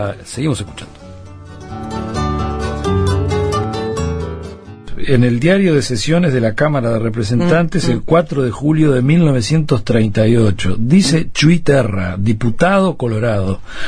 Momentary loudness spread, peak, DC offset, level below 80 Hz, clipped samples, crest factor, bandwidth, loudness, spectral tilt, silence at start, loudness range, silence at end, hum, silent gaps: 15 LU; 0 dBFS; under 0.1%; -32 dBFS; under 0.1%; 14 dB; 11 kHz; -15 LUFS; -6.5 dB/octave; 0 s; 6 LU; 0 s; none; none